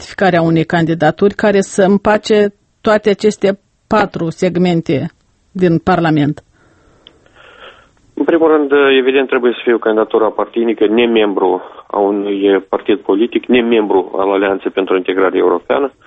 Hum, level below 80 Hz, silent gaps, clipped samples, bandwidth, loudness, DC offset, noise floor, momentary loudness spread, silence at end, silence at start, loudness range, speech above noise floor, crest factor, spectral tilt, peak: none; -48 dBFS; none; under 0.1%; 8.8 kHz; -13 LUFS; under 0.1%; -49 dBFS; 6 LU; 0.15 s; 0 s; 4 LU; 37 dB; 14 dB; -6.5 dB/octave; 0 dBFS